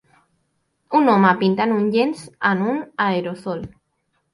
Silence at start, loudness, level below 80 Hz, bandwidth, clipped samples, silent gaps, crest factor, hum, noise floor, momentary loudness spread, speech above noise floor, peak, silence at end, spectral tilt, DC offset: 0.9 s; -19 LUFS; -58 dBFS; 11.5 kHz; under 0.1%; none; 18 dB; none; -70 dBFS; 14 LU; 51 dB; -2 dBFS; 0.65 s; -7 dB/octave; under 0.1%